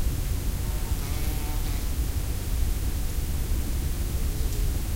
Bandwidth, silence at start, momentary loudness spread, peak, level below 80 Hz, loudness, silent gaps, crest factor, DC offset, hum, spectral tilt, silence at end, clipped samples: 16 kHz; 0 s; 1 LU; -12 dBFS; -28 dBFS; -30 LUFS; none; 14 dB; under 0.1%; none; -5 dB/octave; 0 s; under 0.1%